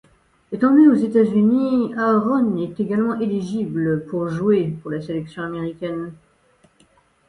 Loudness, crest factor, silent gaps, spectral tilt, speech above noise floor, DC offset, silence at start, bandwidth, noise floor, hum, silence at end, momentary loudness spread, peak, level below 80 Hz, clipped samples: -19 LUFS; 16 dB; none; -9 dB/octave; 39 dB; under 0.1%; 0.5 s; 10.5 kHz; -58 dBFS; none; 1.15 s; 14 LU; -4 dBFS; -58 dBFS; under 0.1%